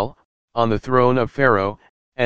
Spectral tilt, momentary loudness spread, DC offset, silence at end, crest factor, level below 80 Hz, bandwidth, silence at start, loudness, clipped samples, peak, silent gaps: -8 dB/octave; 12 LU; under 0.1%; 0 s; 18 dB; -46 dBFS; 7.6 kHz; 0 s; -19 LUFS; under 0.1%; 0 dBFS; 0.25-0.48 s, 1.89-2.12 s